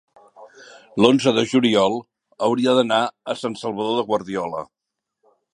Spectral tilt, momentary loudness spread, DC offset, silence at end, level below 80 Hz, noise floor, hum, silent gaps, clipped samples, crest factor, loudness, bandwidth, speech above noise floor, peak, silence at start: -5 dB/octave; 13 LU; under 0.1%; 0.9 s; -64 dBFS; -78 dBFS; none; none; under 0.1%; 20 dB; -20 LUFS; 11 kHz; 58 dB; 0 dBFS; 0.4 s